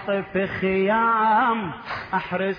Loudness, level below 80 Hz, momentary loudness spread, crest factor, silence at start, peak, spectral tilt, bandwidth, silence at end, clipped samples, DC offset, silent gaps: -22 LUFS; -54 dBFS; 9 LU; 12 dB; 0 s; -10 dBFS; -8 dB/octave; 5.2 kHz; 0 s; under 0.1%; under 0.1%; none